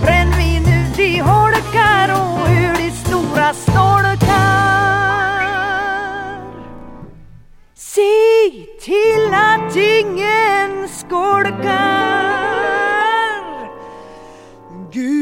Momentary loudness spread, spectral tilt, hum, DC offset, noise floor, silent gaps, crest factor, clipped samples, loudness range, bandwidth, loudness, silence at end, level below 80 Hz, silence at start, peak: 15 LU; -5.5 dB/octave; none; under 0.1%; -41 dBFS; none; 14 dB; under 0.1%; 4 LU; 17 kHz; -14 LUFS; 0 s; -28 dBFS; 0 s; 0 dBFS